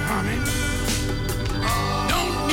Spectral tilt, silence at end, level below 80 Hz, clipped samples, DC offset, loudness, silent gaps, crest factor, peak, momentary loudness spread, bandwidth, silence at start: -4 dB/octave; 0 s; -30 dBFS; under 0.1%; under 0.1%; -24 LUFS; none; 12 dB; -12 dBFS; 4 LU; 19.5 kHz; 0 s